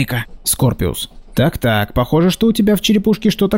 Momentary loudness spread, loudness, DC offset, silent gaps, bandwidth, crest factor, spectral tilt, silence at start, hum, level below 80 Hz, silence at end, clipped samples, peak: 7 LU; -16 LUFS; under 0.1%; none; 16.5 kHz; 12 dB; -5 dB/octave; 0 s; none; -34 dBFS; 0 s; under 0.1%; -4 dBFS